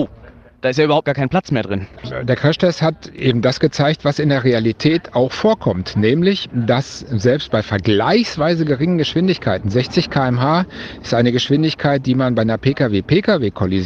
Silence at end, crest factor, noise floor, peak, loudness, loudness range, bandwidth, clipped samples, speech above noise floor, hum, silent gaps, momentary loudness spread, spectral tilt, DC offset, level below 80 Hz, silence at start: 0 s; 16 dB; -42 dBFS; 0 dBFS; -17 LUFS; 1 LU; 7.6 kHz; under 0.1%; 25 dB; none; none; 5 LU; -6.5 dB/octave; under 0.1%; -46 dBFS; 0 s